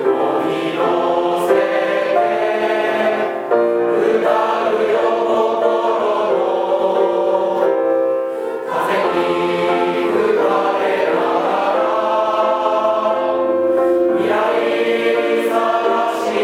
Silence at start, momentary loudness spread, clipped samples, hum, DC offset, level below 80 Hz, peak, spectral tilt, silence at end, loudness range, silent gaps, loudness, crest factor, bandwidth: 0 s; 2 LU; under 0.1%; none; under 0.1%; -66 dBFS; -2 dBFS; -5 dB/octave; 0 s; 1 LU; none; -16 LUFS; 14 dB; 15.5 kHz